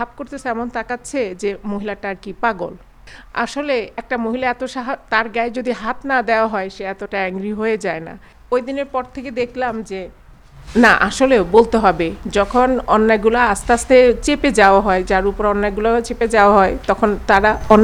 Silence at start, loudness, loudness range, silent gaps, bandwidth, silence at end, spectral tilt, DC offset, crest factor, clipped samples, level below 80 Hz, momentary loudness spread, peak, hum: 0 s; -17 LUFS; 9 LU; none; 14 kHz; 0 s; -5 dB/octave; under 0.1%; 16 dB; under 0.1%; -36 dBFS; 14 LU; 0 dBFS; none